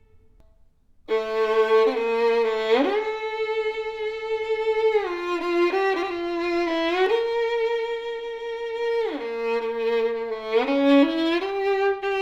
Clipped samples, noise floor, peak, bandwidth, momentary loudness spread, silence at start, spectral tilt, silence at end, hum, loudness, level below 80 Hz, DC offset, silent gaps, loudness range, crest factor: under 0.1%; -56 dBFS; -8 dBFS; 8 kHz; 9 LU; 1.1 s; -4 dB/octave; 0 s; none; -23 LUFS; -58 dBFS; under 0.1%; none; 3 LU; 16 dB